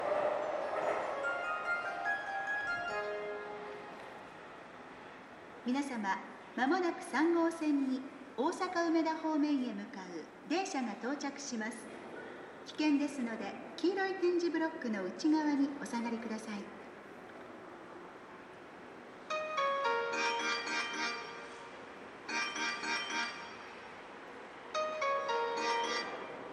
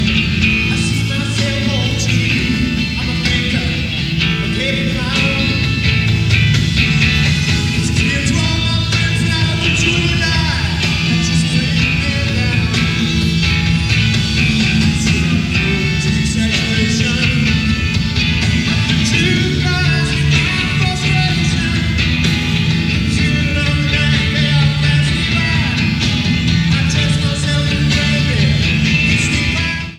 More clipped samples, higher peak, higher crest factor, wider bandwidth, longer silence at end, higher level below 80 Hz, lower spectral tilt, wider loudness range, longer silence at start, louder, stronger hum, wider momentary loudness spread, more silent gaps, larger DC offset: neither; second, -20 dBFS vs 0 dBFS; about the same, 16 dB vs 14 dB; second, 12 kHz vs 14 kHz; about the same, 0 s vs 0 s; second, -78 dBFS vs -26 dBFS; about the same, -3.5 dB/octave vs -4.5 dB/octave; first, 8 LU vs 2 LU; about the same, 0 s vs 0 s; second, -36 LUFS vs -14 LUFS; neither; first, 18 LU vs 3 LU; neither; neither